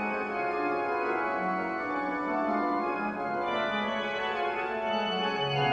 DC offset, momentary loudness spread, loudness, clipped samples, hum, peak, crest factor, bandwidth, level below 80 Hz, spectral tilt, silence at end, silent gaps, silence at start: under 0.1%; 3 LU; -30 LUFS; under 0.1%; none; -16 dBFS; 14 dB; 9.4 kHz; -64 dBFS; -6 dB/octave; 0 s; none; 0 s